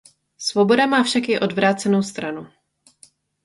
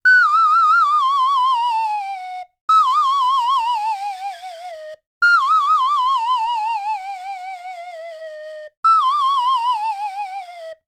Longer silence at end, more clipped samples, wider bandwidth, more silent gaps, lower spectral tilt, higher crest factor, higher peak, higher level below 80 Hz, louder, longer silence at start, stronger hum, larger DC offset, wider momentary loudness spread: first, 1 s vs 0.15 s; neither; second, 11.5 kHz vs 14.5 kHz; second, none vs 2.61-2.68 s, 5.06-5.21 s, 8.77-8.83 s; first, -4.5 dB/octave vs 3.5 dB/octave; first, 18 dB vs 12 dB; about the same, -4 dBFS vs -6 dBFS; first, -64 dBFS vs -70 dBFS; second, -19 LUFS vs -16 LUFS; first, 0.4 s vs 0.05 s; neither; neither; second, 13 LU vs 20 LU